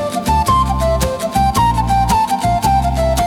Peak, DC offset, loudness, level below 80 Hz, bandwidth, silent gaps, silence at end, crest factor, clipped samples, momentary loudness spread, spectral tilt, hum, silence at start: -2 dBFS; under 0.1%; -15 LUFS; -22 dBFS; 18 kHz; none; 0 s; 12 dB; under 0.1%; 3 LU; -5.5 dB/octave; none; 0 s